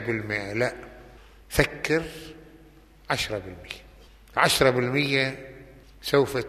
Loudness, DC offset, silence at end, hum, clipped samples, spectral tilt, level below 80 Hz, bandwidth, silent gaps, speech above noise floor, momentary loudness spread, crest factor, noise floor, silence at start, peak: -25 LUFS; under 0.1%; 0 s; none; under 0.1%; -4 dB/octave; -46 dBFS; 15 kHz; none; 27 dB; 20 LU; 24 dB; -52 dBFS; 0 s; -4 dBFS